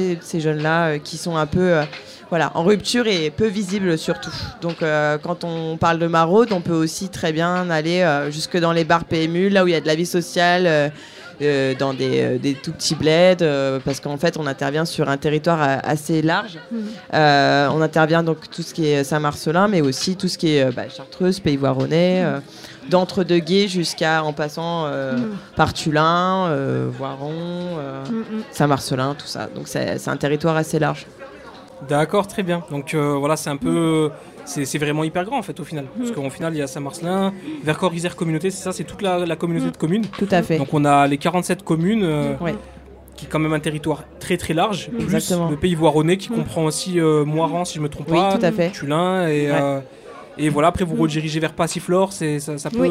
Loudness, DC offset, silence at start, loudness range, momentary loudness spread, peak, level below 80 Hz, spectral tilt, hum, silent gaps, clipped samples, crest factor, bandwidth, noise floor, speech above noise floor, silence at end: -20 LUFS; under 0.1%; 0 s; 4 LU; 10 LU; -2 dBFS; -50 dBFS; -5.5 dB/octave; none; none; under 0.1%; 18 dB; 15.5 kHz; -40 dBFS; 20 dB; 0 s